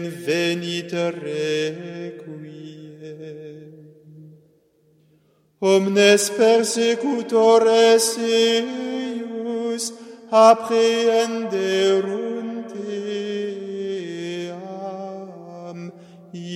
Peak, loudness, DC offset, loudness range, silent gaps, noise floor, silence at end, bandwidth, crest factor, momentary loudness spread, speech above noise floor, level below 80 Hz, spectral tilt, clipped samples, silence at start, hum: 0 dBFS; -20 LUFS; under 0.1%; 14 LU; none; -60 dBFS; 0 s; 15.5 kHz; 20 dB; 22 LU; 42 dB; -78 dBFS; -3.5 dB/octave; under 0.1%; 0 s; none